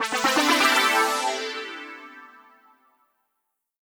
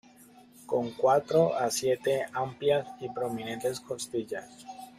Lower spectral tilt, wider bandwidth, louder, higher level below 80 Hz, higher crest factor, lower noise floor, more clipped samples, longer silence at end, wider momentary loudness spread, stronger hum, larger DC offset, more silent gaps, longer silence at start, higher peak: second, 0 dB/octave vs -4.5 dB/octave; first, over 20 kHz vs 15 kHz; first, -21 LUFS vs -29 LUFS; second, -76 dBFS vs -70 dBFS; about the same, 20 dB vs 18 dB; first, -79 dBFS vs -55 dBFS; neither; first, 1.55 s vs 0.1 s; first, 20 LU vs 13 LU; neither; neither; neither; second, 0 s vs 0.6 s; first, -6 dBFS vs -12 dBFS